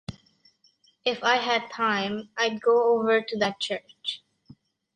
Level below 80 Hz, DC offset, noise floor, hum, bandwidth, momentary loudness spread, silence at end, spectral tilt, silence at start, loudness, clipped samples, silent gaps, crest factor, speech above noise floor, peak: -64 dBFS; under 0.1%; -64 dBFS; none; 9.4 kHz; 12 LU; 0.8 s; -3.5 dB/octave; 0.1 s; -25 LUFS; under 0.1%; none; 18 dB; 39 dB; -8 dBFS